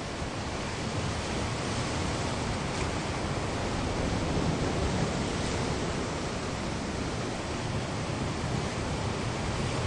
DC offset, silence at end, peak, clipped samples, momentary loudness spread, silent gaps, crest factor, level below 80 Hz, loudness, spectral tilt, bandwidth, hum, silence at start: under 0.1%; 0 s; -18 dBFS; under 0.1%; 4 LU; none; 14 dB; -42 dBFS; -32 LUFS; -5 dB/octave; 11.5 kHz; none; 0 s